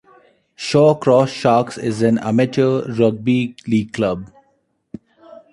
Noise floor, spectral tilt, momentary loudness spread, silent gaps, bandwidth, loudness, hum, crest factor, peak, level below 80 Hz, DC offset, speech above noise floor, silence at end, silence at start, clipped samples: -64 dBFS; -7 dB/octave; 8 LU; none; 11.5 kHz; -17 LUFS; none; 16 dB; 0 dBFS; -54 dBFS; under 0.1%; 48 dB; 0.15 s; 0.6 s; under 0.1%